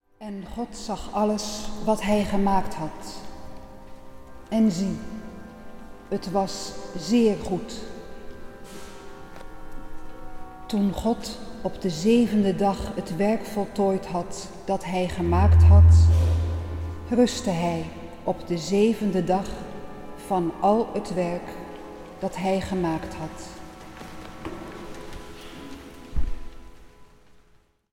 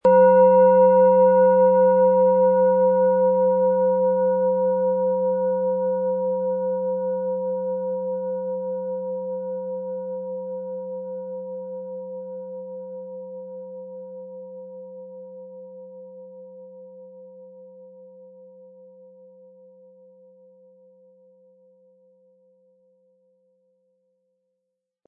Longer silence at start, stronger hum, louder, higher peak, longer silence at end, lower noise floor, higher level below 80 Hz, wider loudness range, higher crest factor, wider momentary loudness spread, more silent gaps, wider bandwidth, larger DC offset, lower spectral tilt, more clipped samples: first, 0.2 s vs 0.05 s; neither; second, -24 LUFS vs -20 LUFS; about the same, -6 dBFS vs -6 dBFS; second, 0.6 s vs 7 s; second, -59 dBFS vs -81 dBFS; first, -32 dBFS vs -78 dBFS; second, 17 LU vs 24 LU; about the same, 20 dB vs 16 dB; second, 22 LU vs 25 LU; neither; first, 12.5 kHz vs 2.9 kHz; first, 0.1% vs under 0.1%; second, -7 dB/octave vs -11.5 dB/octave; neither